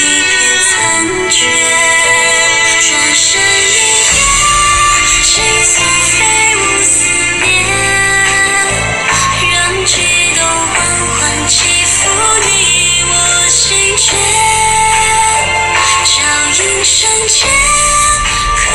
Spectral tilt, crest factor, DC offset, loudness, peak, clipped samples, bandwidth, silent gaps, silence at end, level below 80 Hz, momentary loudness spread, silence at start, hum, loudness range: -0.5 dB/octave; 10 dB; under 0.1%; -7 LUFS; 0 dBFS; under 0.1%; over 20 kHz; none; 0 s; -30 dBFS; 3 LU; 0 s; none; 2 LU